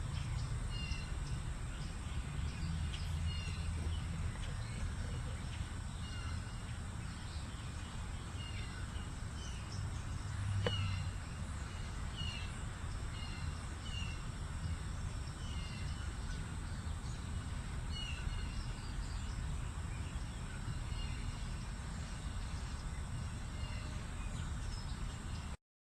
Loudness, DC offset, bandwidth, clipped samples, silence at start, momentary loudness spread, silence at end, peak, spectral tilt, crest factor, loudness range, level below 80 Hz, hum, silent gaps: -43 LUFS; under 0.1%; 13 kHz; under 0.1%; 0 s; 4 LU; 0.4 s; -20 dBFS; -5 dB/octave; 22 dB; 3 LU; -44 dBFS; none; none